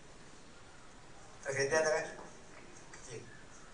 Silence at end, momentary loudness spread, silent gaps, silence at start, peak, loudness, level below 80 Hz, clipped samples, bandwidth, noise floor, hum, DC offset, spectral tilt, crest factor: 0 s; 25 LU; none; 0 s; -18 dBFS; -35 LUFS; -64 dBFS; under 0.1%; 10 kHz; -56 dBFS; none; 0.2%; -3 dB/octave; 22 dB